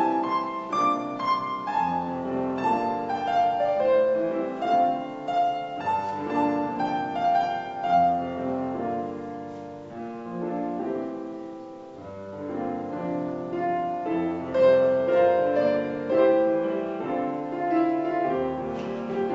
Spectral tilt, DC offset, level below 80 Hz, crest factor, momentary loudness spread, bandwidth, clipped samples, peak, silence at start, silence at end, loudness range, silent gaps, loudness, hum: -7 dB/octave; under 0.1%; -64 dBFS; 16 dB; 14 LU; 7.8 kHz; under 0.1%; -10 dBFS; 0 s; 0 s; 10 LU; none; -26 LUFS; none